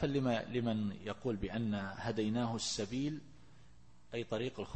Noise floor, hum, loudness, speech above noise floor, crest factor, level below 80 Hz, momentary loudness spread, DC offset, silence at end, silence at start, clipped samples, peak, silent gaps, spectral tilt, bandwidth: -64 dBFS; none; -38 LUFS; 27 dB; 16 dB; -60 dBFS; 6 LU; 0.2%; 0 s; 0 s; under 0.1%; -22 dBFS; none; -5.5 dB/octave; 8.4 kHz